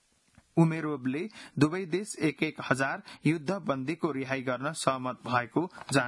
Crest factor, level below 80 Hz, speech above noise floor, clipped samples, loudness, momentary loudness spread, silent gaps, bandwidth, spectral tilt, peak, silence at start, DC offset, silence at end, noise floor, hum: 22 dB; -68 dBFS; 34 dB; under 0.1%; -30 LUFS; 6 LU; none; 12 kHz; -5.5 dB/octave; -8 dBFS; 0.55 s; under 0.1%; 0 s; -64 dBFS; none